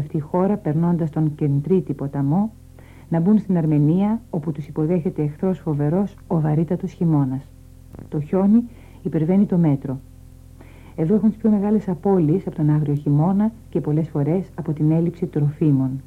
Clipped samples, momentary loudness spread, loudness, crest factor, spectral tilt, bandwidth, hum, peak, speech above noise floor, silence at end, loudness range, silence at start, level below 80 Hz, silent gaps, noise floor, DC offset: under 0.1%; 8 LU; -21 LUFS; 14 dB; -11 dB/octave; 4.1 kHz; none; -6 dBFS; 24 dB; 0.05 s; 2 LU; 0 s; -48 dBFS; none; -43 dBFS; under 0.1%